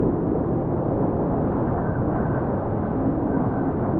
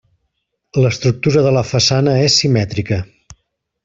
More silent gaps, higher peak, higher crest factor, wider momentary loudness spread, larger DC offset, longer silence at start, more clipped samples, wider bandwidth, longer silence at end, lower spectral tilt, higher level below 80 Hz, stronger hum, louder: neither; second, -10 dBFS vs -2 dBFS; about the same, 12 dB vs 14 dB; second, 1 LU vs 10 LU; neither; second, 0 s vs 0.75 s; neither; second, 3.4 kHz vs 7.8 kHz; second, 0 s vs 0.5 s; first, -11.5 dB/octave vs -5 dB/octave; first, -38 dBFS vs -46 dBFS; neither; second, -24 LUFS vs -14 LUFS